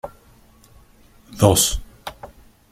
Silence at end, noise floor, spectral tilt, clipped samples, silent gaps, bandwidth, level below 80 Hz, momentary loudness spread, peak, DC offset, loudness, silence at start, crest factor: 0.45 s; -51 dBFS; -4 dB/octave; under 0.1%; none; 16.5 kHz; -38 dBFS; 23 LU; 0 dBFS; under 0.1%; -17 LUFS; 0.05 s; 22 dB